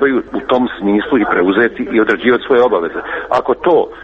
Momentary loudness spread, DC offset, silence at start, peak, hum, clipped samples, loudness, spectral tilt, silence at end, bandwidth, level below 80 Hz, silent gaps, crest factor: 5 LU; under 0.1%; 0 s; 0 dBFS; none; under 0.1%; -14 LUFS; -7 dB/octave; 0 s; 7 kHz; -46 dBFS; none; 14 dB